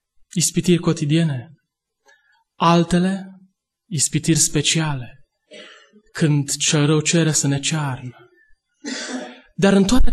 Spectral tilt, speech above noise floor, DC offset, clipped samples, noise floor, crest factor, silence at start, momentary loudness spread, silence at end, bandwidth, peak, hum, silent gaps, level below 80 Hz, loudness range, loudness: -4.5 dB/octave; 54 dB; under 0.1%; under 0.1%; -71 dBFS; 16 dB; 0.35 s; 15 LU; 0 s; 12.5 kHz; -2 dBFS; none; none; -32 dBFS; 2 LU; -19 LUFS